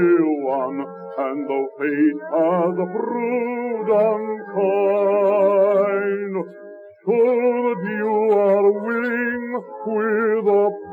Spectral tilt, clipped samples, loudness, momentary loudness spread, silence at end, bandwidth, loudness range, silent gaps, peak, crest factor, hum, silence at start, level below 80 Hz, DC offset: -9.5 dB/octave; under 0.1%; -20 LUFS; 10 LU; 0 s; 4.3 kHz; 2 LU; none; -6 dBFS; 14 dB; none; 0 s; -76 dBFS; under 0.1%